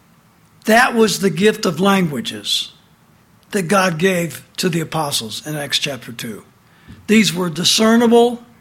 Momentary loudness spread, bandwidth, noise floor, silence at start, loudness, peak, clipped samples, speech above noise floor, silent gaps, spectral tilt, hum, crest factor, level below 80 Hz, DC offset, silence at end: 14 LU; 16.5 kHz; -52 dBFS; 0.65 s; -16 LUFS; -2 dBFS; under 0.1%; 35 dB; none; -4 dB/octave; none; 16 dB; -56 dBFS; under 0.1%; 0.2 s